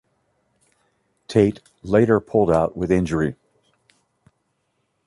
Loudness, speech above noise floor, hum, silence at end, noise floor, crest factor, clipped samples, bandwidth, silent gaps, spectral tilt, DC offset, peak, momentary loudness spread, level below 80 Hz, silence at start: -20 LUFS; 53 dB; none; 1.75 s; -71 dBFS; 20 dB; under 0.1%; 11.5 kHz; none; -8 dB/octave; under 0.1%; -4 dBFS; 7 LU; -46 dBFS; 1.3 s